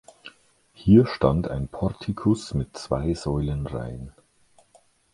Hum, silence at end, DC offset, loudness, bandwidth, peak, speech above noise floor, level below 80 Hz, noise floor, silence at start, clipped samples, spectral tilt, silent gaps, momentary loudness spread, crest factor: none; 1.05 s; under 0.1%; -24 LUFS; 11.5 kHz; -4 dBFS; 37 dB; -40 dBFS; -60 dBFS; 0.25 s; under 0.1%; -8 dB/octave; none; 15 LU; 22 dB